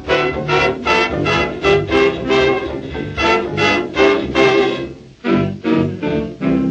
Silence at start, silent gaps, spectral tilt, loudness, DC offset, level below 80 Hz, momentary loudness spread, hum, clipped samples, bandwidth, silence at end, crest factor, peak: 0 s; none; -5.5 dB/octave; -16 LUFS; under 0.1%; -36 dBFS; 7 LU; none; under 0.1%; 8.4 kHz; 0 s; 14 dB; 0 dBFS